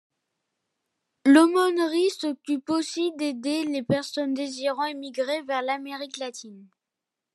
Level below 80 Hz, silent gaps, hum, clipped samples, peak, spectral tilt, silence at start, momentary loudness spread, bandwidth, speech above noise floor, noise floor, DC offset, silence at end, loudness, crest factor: -76 dBFS; none; none; under 0.1%; -6 dBFS; -4.5 dB/octave; 1.25 s; 14 LU; 12.5 kHz; 62 dB; -86 dBFS; under 0.1%; 0.7 s; -25 LUFS; 20 dB